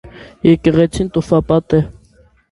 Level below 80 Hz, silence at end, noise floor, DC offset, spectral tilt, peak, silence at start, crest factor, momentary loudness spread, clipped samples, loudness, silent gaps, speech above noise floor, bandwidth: -36 dBFS; 0.65 s; -50 dBFS; under 0.1%; -7.5 dB/octave; 0 dBFS; 0.05 s; 16 dB; 6 LU; under 0.1%; -14 LUFS; none; 37 dB; 11.5 kHz